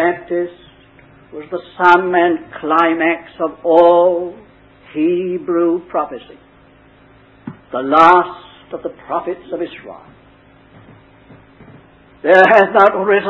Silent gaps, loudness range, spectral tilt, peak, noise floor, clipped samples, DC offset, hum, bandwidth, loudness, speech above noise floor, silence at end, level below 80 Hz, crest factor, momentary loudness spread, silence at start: none; 14 LU; -6.5 dB/octave; 0 dBFS; -47 dBFS; 0.1%; under 0.1%; none; 8 kHz; -14 LUFS; 33 dB; 0 s; -56 dBFS; 16 dB; 20 LU; 0 s